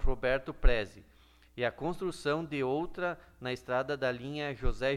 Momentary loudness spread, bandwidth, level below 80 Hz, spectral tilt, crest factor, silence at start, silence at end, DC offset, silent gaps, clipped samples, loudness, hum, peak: 7 LU; 11 kHz; -36 dBFS; -6 dB/octave; 20 dB; 0 s; 0 s; under 0.1%; none; under 0.1%; -34 LUFS; none; -12 dBFS